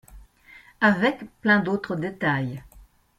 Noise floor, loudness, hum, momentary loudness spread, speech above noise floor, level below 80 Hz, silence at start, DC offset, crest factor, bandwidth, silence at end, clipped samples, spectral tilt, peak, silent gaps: -52 dBFS; -23 LUFS; none; 10 LU; 28 dB; -54 dBFS; 0.1 s; under 0.1%; 18 dB; 13 kHz; 0.35 s; under 0.1%; -7 dB/octave; -8 dBFS; none